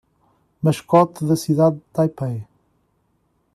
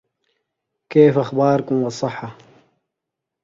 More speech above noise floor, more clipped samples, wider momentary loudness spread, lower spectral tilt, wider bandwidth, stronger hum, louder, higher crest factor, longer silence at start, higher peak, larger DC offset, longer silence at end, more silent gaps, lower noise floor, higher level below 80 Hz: second, 48 dB vs 65 dB; neither; second, 11 LU vs 15 LU; about the same, -7.5 dB/octave vs -7.5 dB/octave; first, 13.5 kHz vs 7.6 kHz; neither; about the same, -19 LUFS vs -18 LUFS; about the same, 18 dB vs 20 dB; second, 0.65 s vs 0.9 s; second, -4 dBFS vs 0 dBFS; neither; about the same, 1.1 s vs 1.1 s; neither; second, -66 dBFS vs -82 dBFS; about the same, -60 dBFS vs -62 dBFS